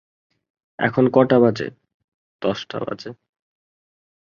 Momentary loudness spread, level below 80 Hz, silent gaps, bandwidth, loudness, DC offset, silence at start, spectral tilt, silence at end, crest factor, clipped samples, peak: 16 LU; -62 dBFS; 1.94-2.39 s; 7.2 kHz; -20 LUFS; under 0.1%; 0.8 s; -7.5 dB/octave; 1.2 s; 20 dB; under 0.1%; -2 dBFS